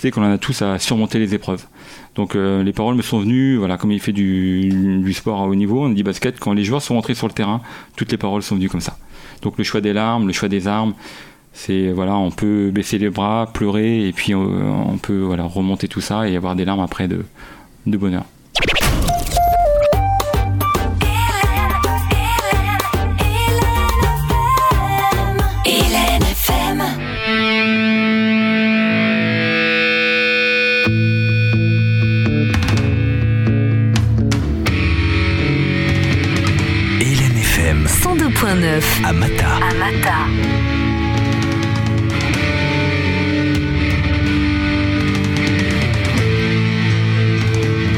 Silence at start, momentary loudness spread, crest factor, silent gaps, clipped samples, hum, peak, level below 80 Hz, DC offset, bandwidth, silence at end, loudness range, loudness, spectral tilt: 0 s; 6 LU; 14 dB; none; under 0.1%; none; -2 dBFS; -26 dBFS; under 0.1%; 17.5 kHz; 0 s; 6 LU; -16 LUFS; -5.5 dB/octave